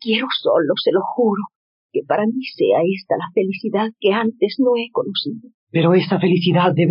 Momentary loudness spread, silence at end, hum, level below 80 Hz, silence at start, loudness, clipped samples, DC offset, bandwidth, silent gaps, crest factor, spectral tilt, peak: 8 LU; 0 s; none; -70 dBFS; 0 s; -18 LUFS; under 0.1%; under 0.1%; 5.4 kHz; 1.55-1.89 s, 5.54-5.67 s; 14 dB; -5 dB/octave; -4 dBFS